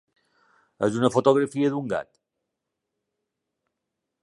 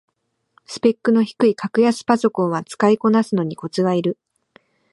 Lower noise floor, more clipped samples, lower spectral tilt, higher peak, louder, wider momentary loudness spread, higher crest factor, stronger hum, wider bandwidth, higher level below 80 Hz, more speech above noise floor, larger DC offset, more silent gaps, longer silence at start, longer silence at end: first, -83 dBFS vs -61 dBFS; neither; about the same, -6.5 dB/octave vs -6.5 dB/octave; about the same, -4 dBFS vs -2 dBFS; second, -24 LUFS vs -19 LUFS; first, 10 LU vs 7 LU; first, 24 dB vs 18 dB; neither; about the same, 11.5 kHz vs 11.5 kHz; about the same, -68 dBFS vs -68 dBFS; first, 60 dB vs 43 dB; neither; neither; about the same, 0.8 s vs 0.7 s; first, 2.2 s vs 0.8 s